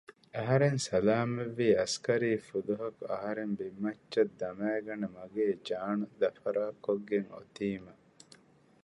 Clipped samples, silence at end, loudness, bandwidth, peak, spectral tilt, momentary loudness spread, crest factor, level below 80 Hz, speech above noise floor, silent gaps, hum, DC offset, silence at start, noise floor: under 0.1%; 0.95 s; -33 LUFS; 11.5 kHz; -14 dBFS; -6 dB/octave; 10 LU; 18 dB; -68 dBFS; 29 dB; none; none; under 0.1%; 0.1 s; -61 dBFS